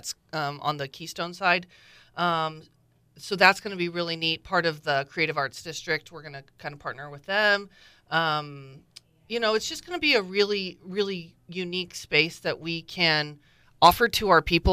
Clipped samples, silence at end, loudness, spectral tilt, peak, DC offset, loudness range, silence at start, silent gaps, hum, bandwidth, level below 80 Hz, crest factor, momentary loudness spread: under 0.1%; 0 s; -25 LUFS; -3.5 dB/octave; -4 dBFS; under 0.1%; 4 LU; 0.05 s; none; none; 15.5 kHz; -46 dBFS; 24 dB; 17 LU